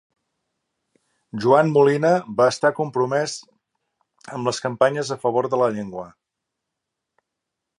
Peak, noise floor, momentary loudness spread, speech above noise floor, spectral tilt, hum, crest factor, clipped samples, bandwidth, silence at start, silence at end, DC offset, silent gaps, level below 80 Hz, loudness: -2 dBFS; -82 dBFS; 18 LU; 62 dB; -5.5 dB/octave; none; 20 dB; under 0.1%; 11.5 kHz; 1.35 s; 1.7 s; under 0.1%; none; -68 dBFS; -20 LUFS